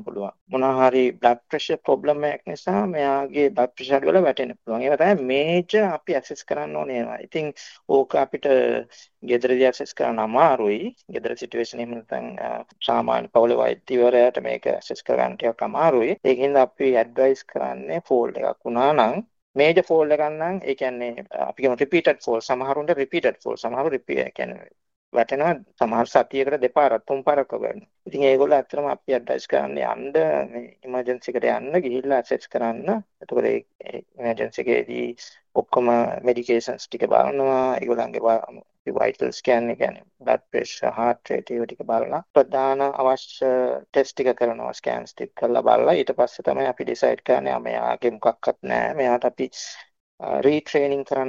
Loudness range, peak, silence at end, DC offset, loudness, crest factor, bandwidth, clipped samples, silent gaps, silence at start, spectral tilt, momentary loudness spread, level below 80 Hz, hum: 3 LU; -2 dBFS; 0 s; under 0.1%; -22 LUFS; 20 dB; 7.4 kHz; under 0.1%; 0.41-0.46 s, 19.42-19.54 s, 24.96-25.12 s, 33.75-33.79 s, 38.79-38.85 s, 42.30-42.34 s, 50.00-50.18 s; 0 s; -5.5 dB/octave; 11 LU; -66 dBFS; none